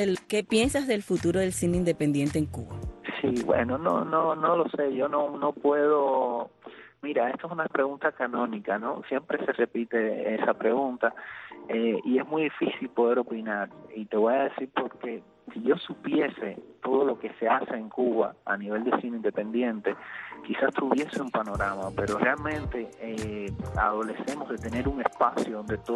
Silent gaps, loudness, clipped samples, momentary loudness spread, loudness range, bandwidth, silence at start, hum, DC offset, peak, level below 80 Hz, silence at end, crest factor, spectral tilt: none; -28 LUFS; under 0.1%; 10 LU; 3 LU; 12.5 kHz; 0 s; none; under 0.1%; -10 dBFS; -50 dBFS; 0 s; 18 dB; -5.5 dB/octave